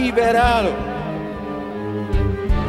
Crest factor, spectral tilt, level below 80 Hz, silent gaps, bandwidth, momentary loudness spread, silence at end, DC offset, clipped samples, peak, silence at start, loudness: 16 dB; -6.5 dB/octave; -26 dBFS; none; 13.5 kHz; 12 LU; 0 s; under 0.1%; under 0.1%; -2 dBFS; 0 s; -21 LUFS